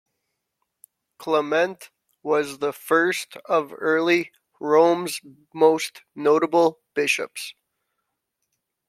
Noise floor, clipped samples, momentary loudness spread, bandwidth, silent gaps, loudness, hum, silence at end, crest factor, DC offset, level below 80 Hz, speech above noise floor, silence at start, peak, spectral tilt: -79 dBFS; under 0.1%; 16 LU; 15.5 kHz; none; -22 LUFS; none; 1.4 s; 20 dB; under 0.1%; -76 dBFS; 57 dB; 1.2 s; -4 dBFS; -4 dB/octave